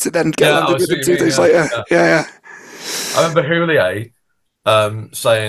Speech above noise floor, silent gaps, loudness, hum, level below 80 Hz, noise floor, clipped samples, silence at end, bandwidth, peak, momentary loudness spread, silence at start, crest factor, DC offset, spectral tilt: 53 dB; none; -15 LUFS; none; -54 dBFS; -68 dBFS; under 0.1%; 0 s; 16 kHz; 0 dBFS; 10 LU; 0 s; 16 dB; under 0.1%; -4 dB/octave